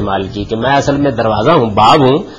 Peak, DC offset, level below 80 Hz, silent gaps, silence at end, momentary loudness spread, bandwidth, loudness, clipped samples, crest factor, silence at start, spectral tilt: 0 dBFS; under 0.1%; -34 dBFS; none; 0 s; 9 LU; 10.5 kHz; -11 LUFS; under 0.1%; 12 dB; 0 s; -6 dB/octave